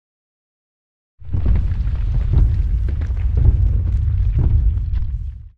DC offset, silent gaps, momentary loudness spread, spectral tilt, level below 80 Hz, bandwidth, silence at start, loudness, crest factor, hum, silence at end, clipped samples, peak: under 0.1%; none; 7 LU; -10 dB/octave; -18 dBFS; 3.5 kHz; 1.2 s; -20 LUFS; 16 dB; none; 0 s; under 0.1%; -2 dBFS